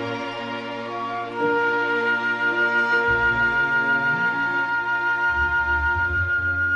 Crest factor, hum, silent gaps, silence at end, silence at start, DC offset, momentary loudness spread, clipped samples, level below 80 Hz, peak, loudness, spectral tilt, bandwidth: 12 dB; none; none; 0 s; 0 s; under 0.1%; 9 LU; under 0.1%; -42 dBFS; -10 dBFS; -21 LUFS; -5.5 dB/octave; 8.2 kHz